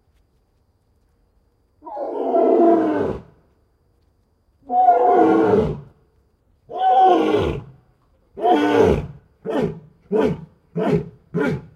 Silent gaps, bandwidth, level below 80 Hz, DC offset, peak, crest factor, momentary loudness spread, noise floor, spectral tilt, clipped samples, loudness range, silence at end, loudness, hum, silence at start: none; 10 kHz; -44 dBFS; under 0.1%; -2 dBFS; 18 dB; 18 LU; -63 dBFS; -8 dB/octave; under 0.1%; 4 LU; 0.1 s; -18 LUFS; none; 1.85 s